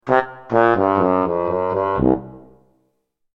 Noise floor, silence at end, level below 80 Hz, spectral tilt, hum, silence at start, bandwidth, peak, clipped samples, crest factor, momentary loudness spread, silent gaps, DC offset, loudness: -69 dBFS; 0.95 s; -44 dBFS; -9 dB/octave; none; 0.05 s; 6.6 kHz; 0 dBFS; under 0.1%; 18 dB; 5 LU; none; under 0.1%; -18 LUFS